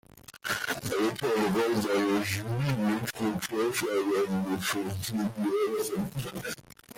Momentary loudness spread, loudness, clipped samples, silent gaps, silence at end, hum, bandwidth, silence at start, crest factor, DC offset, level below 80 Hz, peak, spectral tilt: 8 LU; -30 LUFS; under 0.1%; none; 0.05 s; none; 17 kHz; 0.35 s; 14 dB; under 0.1%; -60 dBFS; -16 dBFS; -5 dB/octave